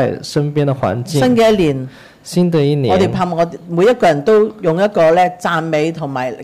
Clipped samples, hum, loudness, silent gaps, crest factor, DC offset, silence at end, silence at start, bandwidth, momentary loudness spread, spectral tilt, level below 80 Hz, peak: under 0.1%; none; -14 LUFS; none; 10 dB; 0.2%; 0 s; 0 s; 15.5 kHz; 8 LU; -6.5 dB/octave; -46 dBFS; -4 dBFS